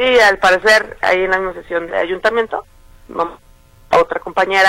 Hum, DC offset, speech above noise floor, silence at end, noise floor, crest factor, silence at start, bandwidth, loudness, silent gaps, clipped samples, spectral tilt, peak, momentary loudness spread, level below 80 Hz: none; under 0.1%; 19 dB; 0 s; -34 dBFS; 14 dB; 0 s; 16.5 kHz; -15 LUFS; none; under 0.1%; -3 dB/octave; 0 dBFS; 12 LU; -44 dBFS